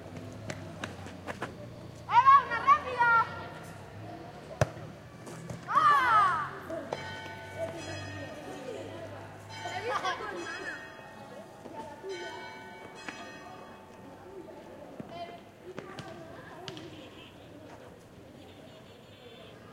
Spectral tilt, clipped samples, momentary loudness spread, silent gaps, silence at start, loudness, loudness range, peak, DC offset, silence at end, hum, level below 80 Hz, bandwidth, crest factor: -4.5 dB/octave; under 0.1%; 25 LU; none; 0 s; -29 LUFS; 19 LU; -8 dBFS; under 0.1%; 0 s; none; -64 dBFS; 15.5 kHz; 24 dB